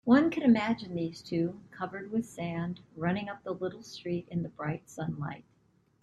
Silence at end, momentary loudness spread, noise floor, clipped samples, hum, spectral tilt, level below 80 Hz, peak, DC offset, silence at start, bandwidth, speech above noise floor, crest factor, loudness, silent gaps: 0.6 s; 14 LU; -68 dBFS; under 0.1%; none; -7 dB/octave; -64 dBFS; -12 dBFS; under 0.1%; 0.05 s; 12 kHz; 37 dB; 20 dB; -32 LUFS; none